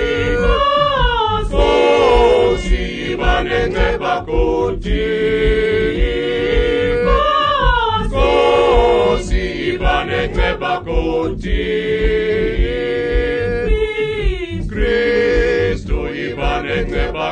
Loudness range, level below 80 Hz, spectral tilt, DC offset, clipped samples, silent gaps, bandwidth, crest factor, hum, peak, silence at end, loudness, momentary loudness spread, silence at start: 4 LU; -22 dBFS; -6 dB/octave; under 0.1%; under 0.1%; none; 9.4 kHz; 16 dB; none; 0 dBFS; 0 s; -16 LUFS; 8 LU; 0 s